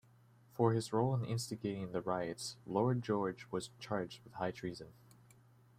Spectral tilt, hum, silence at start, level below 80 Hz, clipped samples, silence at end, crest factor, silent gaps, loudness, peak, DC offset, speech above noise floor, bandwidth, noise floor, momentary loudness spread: -6 dB/octave; none; 0.55 s; -72 dBFS; under 0.1%; 0.85 s; 22 dB; none; -38 LUFS; -16 dBFS; under 0.1%; 28 dB; 15 kHz; -65 dBFS; 11 LU